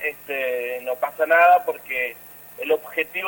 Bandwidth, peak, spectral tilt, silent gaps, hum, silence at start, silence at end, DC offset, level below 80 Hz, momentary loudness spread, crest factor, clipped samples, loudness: 17 kHz; -4 dBFS; -2.5 dB/octave; none; none; 0 s; 0 s; under 0.1%; -68 dBFS; 14 LU; 18 dB; under 0.1%; -21 LUFS